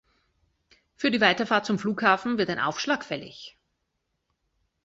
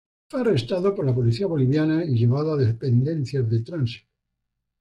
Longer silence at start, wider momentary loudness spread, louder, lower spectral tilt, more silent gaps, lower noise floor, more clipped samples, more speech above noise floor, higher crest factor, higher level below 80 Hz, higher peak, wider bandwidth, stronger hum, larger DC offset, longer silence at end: first, 1 s vs 0.35 s; first, 16 LU vs 7 LU; about the same, -25 LUFS vs -23 LUFS; second, -4.5 dB/octave vs -9 dB/octave; neither; about the same, -78 dBFS vs -79 dBFS; neither; second, 53 dB vs 58 dB; first, 24 dB vs 12 dB; second, -66 dBFS vs -56 dBFS; first, -4 dBFS vs -10 dBFS; about the same, 8 kHz vs 8.2 kHz; neither; neither; first, 1.35 s vs 0.8 s